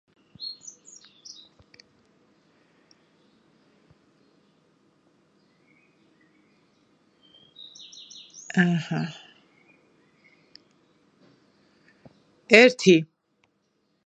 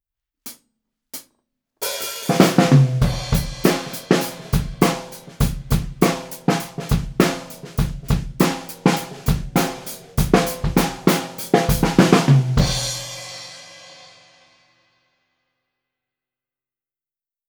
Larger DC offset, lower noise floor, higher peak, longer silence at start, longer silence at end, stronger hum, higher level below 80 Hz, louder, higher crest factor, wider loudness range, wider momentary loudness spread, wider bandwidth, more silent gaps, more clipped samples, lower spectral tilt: neither; second, -71 dBFS vs under -90 dBFS; about the same, 0 dBFS vs 0 dBFS; about the same, 0.4 s vs 0.45 s; second, 1 s vs 3.55 s; first, 50 Hz at -70 dBFS vs none; second, -76 dBFS vs -32 dBFS; about the same, -21 LUFS vs -20 LUFS; first, 28 dB vs 20 dB; first, 25 LU vs 4 LU; first, 31 LU vs 19 LU; second, 9.6 kHz vs over 20 kHz; neither; neither; about the same, -5 dB/octave vs -5.5 dB/octave